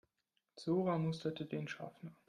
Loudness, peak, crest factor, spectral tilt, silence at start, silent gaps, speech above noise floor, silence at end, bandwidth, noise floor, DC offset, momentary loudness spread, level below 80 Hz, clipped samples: -40 LUFS; -24 dBFS; 16 dB; -7.5 dB/octave; 0.55 s; none; 46 dB; 0.15 s; 10 kHz; -86 dBFS; under 0.1%; 12 LU; -80 dBFS; under 0.1%